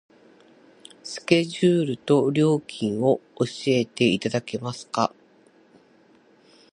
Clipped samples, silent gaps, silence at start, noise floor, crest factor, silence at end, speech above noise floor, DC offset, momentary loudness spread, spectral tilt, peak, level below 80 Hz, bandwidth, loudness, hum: under 0.1%; none; 1.05 s; -57 dBFS; 22 dB; 1.65 s; 34 dB; under 0.1%; 10 LU; -6 dB/octave; -2 dBFS; -66 dBFS; 11 kHz; -23 LUFS; none